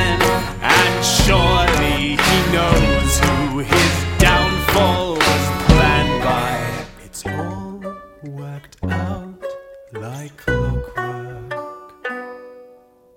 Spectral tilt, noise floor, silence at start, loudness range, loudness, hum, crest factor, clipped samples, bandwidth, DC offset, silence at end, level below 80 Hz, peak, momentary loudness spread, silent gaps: -4 dB/octave; -48 dBFS; 0 s; 12 LU; -16 LUFS; none; 18 dB; under 0.1%; 17 kHz; under 0.1%; 0.5 s; -26 dBFS; 0 dBFS; 18 LU; none